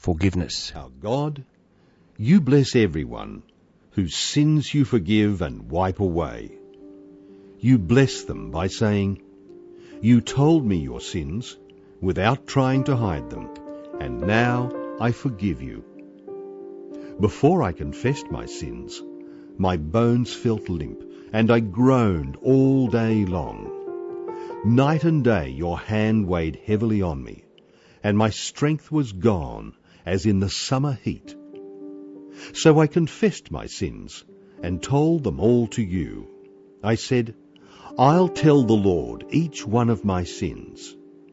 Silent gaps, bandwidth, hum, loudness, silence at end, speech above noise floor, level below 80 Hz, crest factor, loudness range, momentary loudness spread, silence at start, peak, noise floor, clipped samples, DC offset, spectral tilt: none; 8 kHz; none; -22 LUFS; 0.4 s; 36 dB; -44 dBFS; 20 dB; 5 LU; 20 LU; 0 s; -2 dBFS; -57 dBFS; under 0.1%; under 0.1%; -6.5 dB/octave